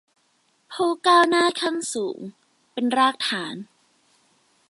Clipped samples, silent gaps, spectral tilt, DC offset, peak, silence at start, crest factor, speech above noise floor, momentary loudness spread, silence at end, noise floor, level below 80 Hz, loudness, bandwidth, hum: under 0.1%; none; -2.5 dB/octave; under 0.1%; -4 dBFS; 0.7 s; 20 dB; 44 dB; 20 LU; 1.05 s; -66 dBFS; -78 dBFS; -21 LUFS; 11.5 kHz; none